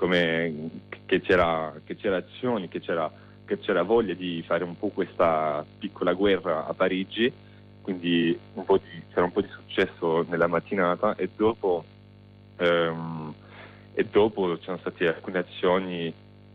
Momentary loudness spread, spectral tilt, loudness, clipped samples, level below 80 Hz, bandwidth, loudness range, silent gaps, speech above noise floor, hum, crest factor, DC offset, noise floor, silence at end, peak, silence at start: 11 LU; -7.5 dB/octave; -26 LUFS; under 0.1%; -58 dBFS; 6.4 kHz; 2 LU; none; 25 dB; 50 Hz at -50 dBFS; 16 dB; under 0.1%; -50 dBFS; 0.4 s; -10 dBFS; 0 s